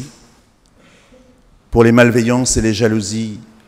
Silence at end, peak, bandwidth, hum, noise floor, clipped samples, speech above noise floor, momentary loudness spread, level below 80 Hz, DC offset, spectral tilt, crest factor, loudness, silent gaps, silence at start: 0.25 s; 0 dBFS; 15.5 kHz; none; -51 dBFS; under 0.1%; 38 dB; 14 LU; -34 dBFS; under 0.1%; -5 dB/octave; 16 dB; -13 LUFS; none; 0 s